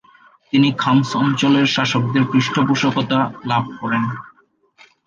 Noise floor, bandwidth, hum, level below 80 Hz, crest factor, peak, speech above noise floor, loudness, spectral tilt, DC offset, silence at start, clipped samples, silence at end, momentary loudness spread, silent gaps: -53 dBFS; 7.4 kHz; none; -58 dBFS; 16 dB; -2 dBFS; 36 dB; -17 LUFS; -5.5 dB/octave; under 0.1%; 0.55 s; under 0.1%; 0.8 s; 6 LU; none